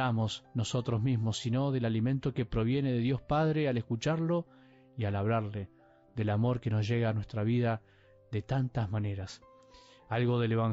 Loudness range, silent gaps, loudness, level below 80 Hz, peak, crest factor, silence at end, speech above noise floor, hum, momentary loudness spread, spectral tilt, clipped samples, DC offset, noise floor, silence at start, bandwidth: 3 LU; none; -32 LUFS; -56 dBFS; -20 dBFS; 12 dB; 0 s; 27 dB; none; 10 LU; -7 dB/octave; under 0.1%; under 0.1%; -58 dBFS; 0 s; 7.6 kHz